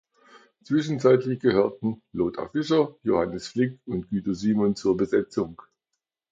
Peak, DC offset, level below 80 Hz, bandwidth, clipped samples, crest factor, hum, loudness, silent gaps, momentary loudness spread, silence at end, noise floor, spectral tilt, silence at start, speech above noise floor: -6 dBFS; under 0.1%; -56 dBFS; 7.8 kHz; under 0.1%; 18 dB; none; -25 LUFS; none; 9 LU; 0.75 s; -83 dBFS; -7 dB/octave; 0.7 s; 59 dB